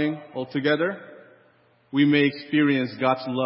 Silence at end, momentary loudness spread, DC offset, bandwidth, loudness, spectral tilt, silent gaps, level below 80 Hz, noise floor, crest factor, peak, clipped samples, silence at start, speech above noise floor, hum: 0 s; 10 LU; under 0.1%; 5.8 kHz; -23 LUFS; -10.5 dB/octave; none; -74 dBFS; -60 dBFS; 16 dB; -8 dBFS; under 0.1%; 0 s; 37 dB; none